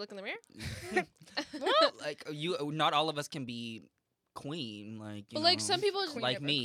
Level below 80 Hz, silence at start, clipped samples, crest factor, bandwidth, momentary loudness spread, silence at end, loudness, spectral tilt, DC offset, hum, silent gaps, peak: -70 dBFS; 0 s; under 0.1%; 22 dB; 15.5 kHz; 17 LU; 0 s; -33 LUFS; -3.5 dB/octave; under 0.1%; none; none; -12 dBFS